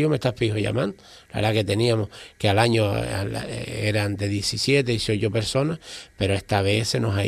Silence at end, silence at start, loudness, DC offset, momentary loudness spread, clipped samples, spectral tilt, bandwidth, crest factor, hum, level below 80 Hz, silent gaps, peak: 0 s; 0 s; -23 LUFS; under 0.1%; 9 LU; under 0.1%; -5.5 dB/octave; 14 kHz; 18 dB; none; -48 dBFS; none; -4 dBFS